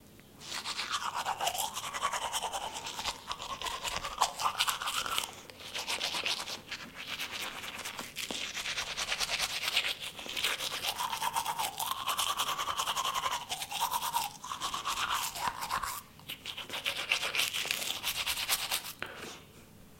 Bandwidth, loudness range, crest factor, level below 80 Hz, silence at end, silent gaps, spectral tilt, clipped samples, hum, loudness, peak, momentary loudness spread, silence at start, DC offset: 17 kHz; 3 LU; 26 dB; -62 dBFS; 0 s; none; 0 dB/octave; under 0.1%; none; -33 LUFS; -10 dBFS; 10 LU; 0 s; under 0.1%